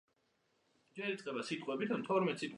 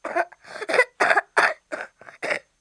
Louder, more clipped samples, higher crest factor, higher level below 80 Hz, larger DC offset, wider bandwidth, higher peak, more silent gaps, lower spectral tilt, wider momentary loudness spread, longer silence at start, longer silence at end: second, -38 LUFS vs -22 LUFS; neither; second, 18 dB vs 24 dB; second, -88 dBFS vs -74 dBFS; neither; about the same, 11.5 kHz vs 10.5 kHz; second, -20 dBFS vs 0 dBFS; neither; first, -5.5 dB/octave vs -2 dB/octave; second, 8 LU vs 16 LU; first, 0.95 s vs 0.05 s; second, 0 s vs 0.2 s